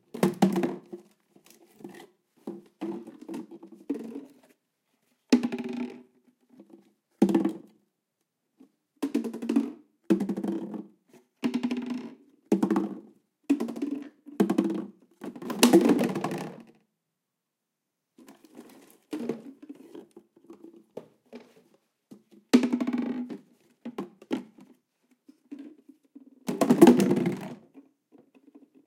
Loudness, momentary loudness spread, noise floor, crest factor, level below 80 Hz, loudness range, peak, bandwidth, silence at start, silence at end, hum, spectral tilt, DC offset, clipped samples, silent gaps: -27 LUFS; 24 LU; -84 dBFS; 28 dB; -76 dBFS; 17 LU; -2 dBFS; 16.5 kHz; 0.15 s; 1.05 s; none; -5.5 dB/octave; under 0.1%; under 0.1%; none